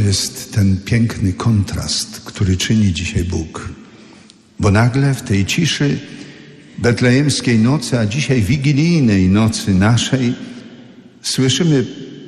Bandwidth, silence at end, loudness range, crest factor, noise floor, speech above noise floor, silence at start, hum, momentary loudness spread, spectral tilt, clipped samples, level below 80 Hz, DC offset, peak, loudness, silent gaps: 13 kHz; 0 s; 4 LU; 12 dB; -44 dBFS; 29 dB; 0 s; none; 13 LU; -5.5 dB/octave; under 0.1%; -38 dBFS; under 0.1%; -4 dBFS; -16 LUFS; none